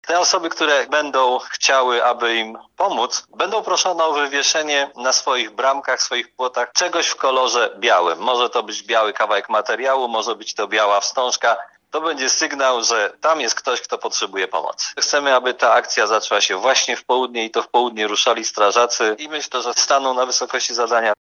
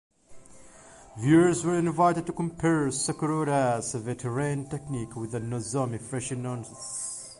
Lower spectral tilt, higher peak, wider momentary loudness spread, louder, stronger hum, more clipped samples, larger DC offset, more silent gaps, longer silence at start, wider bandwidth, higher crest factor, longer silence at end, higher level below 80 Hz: second, 0.5 dB/octave vs -5.5 dB/octave; first, 0 dBFS vs -10 dBFS; second, 6 LU vs 12 LU; first, -18 LUFS vs -28 LUFS; neither; neither; neither; neither; second, 0.05 s vs 0.3 s; about the same, 12 kHz vs 11.5 kHz; about the same, 18 dB vs 18 dB; about the same, 0.1 s vs 0.05 s; second, -78 dBFS vs -58 dBFS